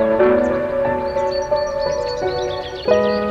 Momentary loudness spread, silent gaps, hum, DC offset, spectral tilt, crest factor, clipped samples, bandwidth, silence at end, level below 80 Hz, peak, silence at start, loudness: 7 LU; none; none; under 0.1%; -5.5 dB/octave; 18 dB; under 0.1%; 7.8 kHz; 0 s; -40 dBFS; 0 dBFS; 0 s; -19 LUFS